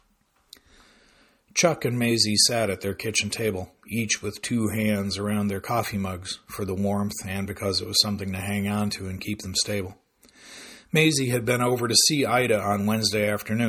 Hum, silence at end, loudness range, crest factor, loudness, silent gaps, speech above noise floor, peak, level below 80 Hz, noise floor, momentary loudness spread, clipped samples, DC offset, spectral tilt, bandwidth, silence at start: none; 0 s; 5 LU; 22 dB; -24 LUFS; none; 41 dB; -4 dBFS; -58 dBFS; -66 dBFS; 12 LU; under 0.1%; under 0.1%; -3.5 dB/octave; 17.5 kHz; 1.55 s